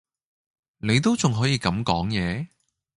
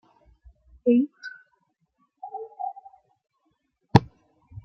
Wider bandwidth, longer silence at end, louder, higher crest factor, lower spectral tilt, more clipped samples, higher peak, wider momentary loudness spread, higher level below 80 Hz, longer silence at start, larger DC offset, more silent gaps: first, 11.5 kHz vs 7.8 kHz; first, 0.5 s vs 0.05 s; about the same, -23 LUFS vs -24 LUFS; second, 20 dB vs 28 dB; second, -5 dB/octave vs -8.5 dB/octave; neither; second, -6 dBFS vs 0 dBFS; second, 11 LU vs 20 LU; first, -46 dBFS vs -56 dBFS; about the same, 0.85 s vs 0.85 s; neither; neither